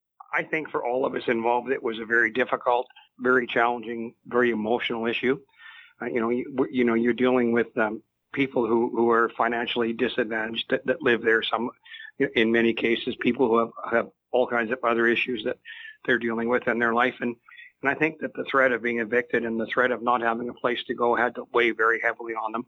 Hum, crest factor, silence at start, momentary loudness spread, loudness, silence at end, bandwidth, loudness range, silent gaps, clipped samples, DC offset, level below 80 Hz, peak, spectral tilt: none; 18 dB; 0.3 s; 9 LU; -25 LUFS; 0.05 s; 6.6 kHz; 2 LU; none; under 0.1%; under 0.1%; -66 dBFS; -6 dBFS; -6.5 dB/octave